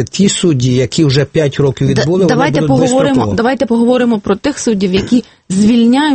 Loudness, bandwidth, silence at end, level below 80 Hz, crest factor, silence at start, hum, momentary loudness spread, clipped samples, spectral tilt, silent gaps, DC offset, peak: -12 LUFS; 8.8 kHz; 0 s; -40 dBFS; 10 dB; 0 s; none; 4 LU; under 0.1%; -5.5 dB/octave; none; under 0.1%; 0 dBFS